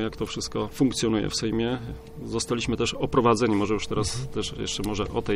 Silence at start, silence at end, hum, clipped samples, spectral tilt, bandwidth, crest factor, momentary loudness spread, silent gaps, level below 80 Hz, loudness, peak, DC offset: 0 s; 0 s; none; under 0.1%; -5 dB/octave; 16 kHz; 18 dB; 9 LU; none; -42 dBFS; -26 LUFS; -8 dBFS; under 0.1%